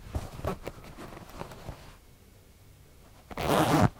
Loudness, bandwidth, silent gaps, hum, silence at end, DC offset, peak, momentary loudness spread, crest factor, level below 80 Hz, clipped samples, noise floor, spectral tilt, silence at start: -31 LUFS; 18 kHz; none; none; 0 s; under 0.1%; -8 dBFS; 21 LU; 24 dB; -46 dBFS; under 0.1%; -55 dBFS; -6 dB/octave; 0 s